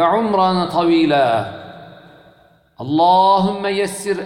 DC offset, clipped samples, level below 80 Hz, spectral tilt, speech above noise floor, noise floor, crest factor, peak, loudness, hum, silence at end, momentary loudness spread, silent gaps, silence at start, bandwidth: under 0.1%; under 0.1%; -52 dBFS; -5.5 dB/octave; 36 dB; -51 dBFS; 14 dB; -4 dBFS; -16 LUFS; none; 0 s; 17 LU; none; 0 s; 14.5 kHz